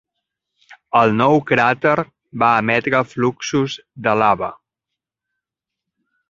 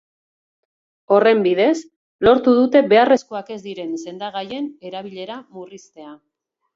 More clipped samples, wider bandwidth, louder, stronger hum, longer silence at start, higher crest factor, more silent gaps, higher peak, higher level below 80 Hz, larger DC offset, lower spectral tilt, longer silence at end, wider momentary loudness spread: neither; about the same, 7.6 kHz vs 7.8 kHz; about the same, -17 LUFS vs -17 LUFS; neither; second, 0.7 s vs 1.1 s; about the same, 18 dB vs 18 dB; second, none vs 1.96-2.19 s; about the same, 0 dBFS vs -2 dBFS; about the same, -56 dBFS vs -56 dBFS; neither; about the same, -5.5 dB/octave vs -5.5 dB/octave; first, 1.75 s vs 0.6 s; second, 8 LU vs 19 LU